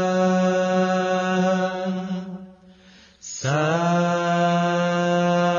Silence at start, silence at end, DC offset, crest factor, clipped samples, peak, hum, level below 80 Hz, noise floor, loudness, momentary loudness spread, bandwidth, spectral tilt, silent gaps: 0 s; 0 s; under 0.1%; 12 dB; under 0.1%; -10 dBFS; none; -66 dBFS; -51 dBFS; -21 LUFS; 11 LU; 7.4 kHz; -6 dB/octave; none